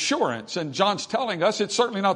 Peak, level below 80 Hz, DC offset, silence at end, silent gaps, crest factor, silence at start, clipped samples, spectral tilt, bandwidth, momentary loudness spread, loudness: -6 dBFS; -72 dBFS; under 0.1%; 0 s; none; 18 dB; 0 s; under 0.1%; -3.5 dB/octave; 11 kHz; 5 LU; -24 LUFS